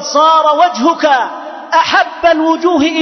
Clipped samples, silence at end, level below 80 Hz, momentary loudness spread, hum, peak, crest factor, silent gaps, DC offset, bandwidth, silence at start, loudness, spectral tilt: under 0.1%; 0 s; -50 dBFS; 6 LU; none; 0 dBFS; 10 dB; none; under 0.1%; 6.4 kHz; 0 s; -11 LUFS; -2.5 dB/octave